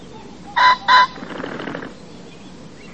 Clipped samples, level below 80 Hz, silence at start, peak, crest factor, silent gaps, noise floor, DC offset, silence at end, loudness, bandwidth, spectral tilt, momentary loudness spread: under 0.1%; -54 dBFS; 0 s; -2 dBFS; 18 dB; none; -39 dBFS; 0.6%; 0 s; -16 LUFS; 8.6 kHz; -3 dB/octave; 23 LU